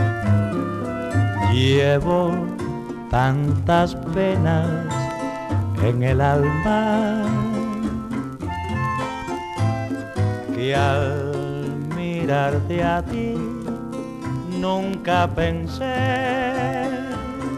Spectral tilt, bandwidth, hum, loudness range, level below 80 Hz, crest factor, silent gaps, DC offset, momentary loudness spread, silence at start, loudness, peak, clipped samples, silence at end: -7 dB/octave; 12.5 kHz; none; 4 LU; -40 dBFS; 16 dB; none; under 0.1%; 9 LU; 0 s; -22 LUFS; -4 dBFS; under 0.1%; 0 s